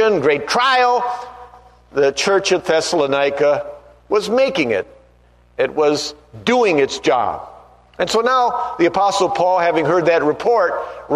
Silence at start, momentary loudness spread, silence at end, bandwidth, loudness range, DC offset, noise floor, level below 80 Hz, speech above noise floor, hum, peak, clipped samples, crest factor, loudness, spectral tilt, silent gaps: 0 s; 9 LU; 0 s; 13.5 kHz; 3 LU; under 0.1%; -51 dBFS; -52 dBFS; 35 dB; 60 Hz at -50 dBFS; -2 dBFS; under 0.1%; 16 dB; -17 LUFS; -3.5 dB/octave; none